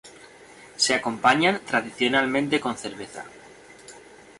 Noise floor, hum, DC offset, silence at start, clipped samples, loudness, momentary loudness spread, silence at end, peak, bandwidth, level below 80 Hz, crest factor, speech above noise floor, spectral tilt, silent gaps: -48 dBFS; none; under 0.1%; 0.05 s; under 0.1%; -22 LUFS; 23 LU; 0.4 s; -6 dBFS; 11.5 kHz; -64 dBFS; 20 dB; 24 dB; -3 dB/octave; none